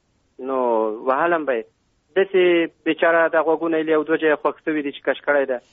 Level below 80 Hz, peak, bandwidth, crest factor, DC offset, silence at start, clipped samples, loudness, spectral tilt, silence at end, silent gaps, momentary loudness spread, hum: -68 dBFS; -6 dBFS; 3.9 kHz; 14 dB; under 0.1%; 0.4 s; under 0.1%; -20 LUFS; -2.5 dB/octave; 0.15 s; none; 8 LU; none